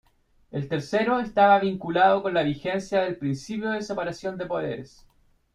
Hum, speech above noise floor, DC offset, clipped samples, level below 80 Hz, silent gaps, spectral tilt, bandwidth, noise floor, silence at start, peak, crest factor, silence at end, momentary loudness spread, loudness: none; 37 dB; under 0.1%; under 0.1%; -58 dBFS; none; -6 dB/octave; 10.5 kHz; -61 dBFS; 0.55 s; -6 dBFS; 20 dB; 0.7 s; 13 LU; -25 LUFS